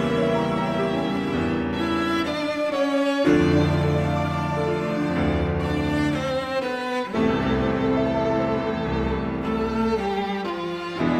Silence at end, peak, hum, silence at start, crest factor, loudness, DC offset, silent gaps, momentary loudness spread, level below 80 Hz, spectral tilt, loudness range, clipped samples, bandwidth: 0 s; -8 dBFS; none; 0 s; 16 dB; -23 LUFS; under 0.1%; none; 5 LU; -40 dBFS; -7 dB/octave; 2 LU; under 0.1%; 14.5 kHz